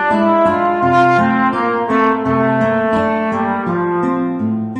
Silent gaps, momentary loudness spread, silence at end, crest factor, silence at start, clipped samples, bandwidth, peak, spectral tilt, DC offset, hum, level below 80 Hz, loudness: none; 5 LU; 0 s; 14 dB; 0 s; under 0.1%; 9.4 kHz; 0 dBFS; -8 dB/octave; under 0.1%; none; -50 dBFS; -15 LUFS